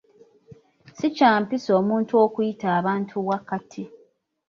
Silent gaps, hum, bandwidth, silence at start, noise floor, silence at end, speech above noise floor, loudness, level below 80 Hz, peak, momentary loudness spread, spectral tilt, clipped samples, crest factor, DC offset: none; none; 7.2 kHz; 0.5 s; -60 dBFS; 0.6 s; 39 dB; -22 LUFS; -70 dBFS; -4 dBFS; 13 LU; -6.5 dB/octave; under 0.1%; 20 dB; under 0.1%